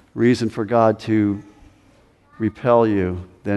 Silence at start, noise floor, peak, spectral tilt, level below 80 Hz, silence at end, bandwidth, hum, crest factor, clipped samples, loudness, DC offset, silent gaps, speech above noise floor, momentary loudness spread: 0.15 s; -54 dBFS; -2 dBFS; -7.5 dB/octave; -52 dBFS; 0 s; 11.5 kHz; none; 18 dB; under 0.1%; -19 LUFS; under 0.1%; none; 36 dB; 10 LU